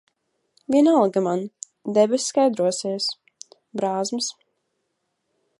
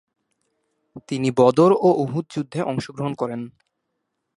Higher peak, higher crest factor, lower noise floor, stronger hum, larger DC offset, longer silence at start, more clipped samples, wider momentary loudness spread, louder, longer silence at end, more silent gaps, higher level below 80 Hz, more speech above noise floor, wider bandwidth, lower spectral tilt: second, -6 dBFS vs -2 dBFS; about the same, 18 dB vs 20 dB; about the same, -75 dBFS vs -77 dBFS; neither; neither; second, 0.7 s vs 0.95 s; neither; first, 17 LU vs 14 LU; about the same, -22 LUFS vs -20 LUFS; first, 1.3 s vs 0.9 s; neither; second, -74 dBFS vs -62 dBFS; about the same, 55 dB vs 57 dB; about the same, 11.5 kHz vs 11.5 kHz; second, -4.5 dB/octave vs -7.5 dB/octave